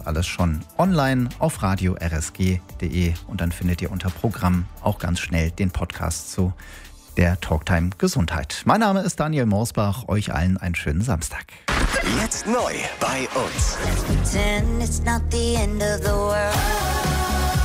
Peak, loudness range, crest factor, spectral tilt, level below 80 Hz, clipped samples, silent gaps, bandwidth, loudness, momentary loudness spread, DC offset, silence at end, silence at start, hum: -4 dBFS; 3 LU; 18 dB; -5 dB/octave; -30 dBFS; under 0.1%; none; 16 kHz; -23 LUFS; 5 LU; under 0.1%; 0 s; 0 s; none